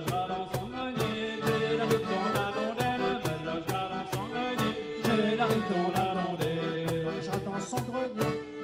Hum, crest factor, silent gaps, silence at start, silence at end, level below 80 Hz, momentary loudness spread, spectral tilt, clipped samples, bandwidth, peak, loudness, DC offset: none; 16 dB; none; 0 s; 0 s; -58 dBFS; 6 LU; -5.5 dB/octave; under 0.1%; 16 kHz; -14 dBFS; -31 LUFS; under 0.1%